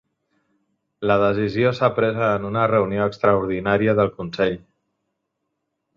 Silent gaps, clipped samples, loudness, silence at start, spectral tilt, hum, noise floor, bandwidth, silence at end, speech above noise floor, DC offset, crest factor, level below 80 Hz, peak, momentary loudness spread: none; under 0.1%; -20 LUFS; 1 s; -8 dB/octave; none; -77 dBFS; 7.2 kHz; 1.4 s; 57 dB; under 0.1%; 18 dB; -52 dBFS; -4 dBFS; 5 LU